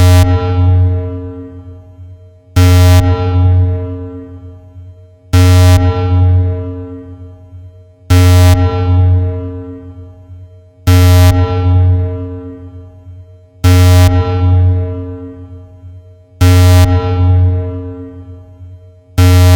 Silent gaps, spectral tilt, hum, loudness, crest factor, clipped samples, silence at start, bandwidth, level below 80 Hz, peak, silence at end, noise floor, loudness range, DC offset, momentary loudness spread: none; -6.5 dB/octave; none; -10 LUFS; 10 dB; under 0.1%; 0 s; 17 kHz; -24 dBFS; 0 dBFS; 0 s; -36 dBFS; 1 LU; under 0.1%; 22 LU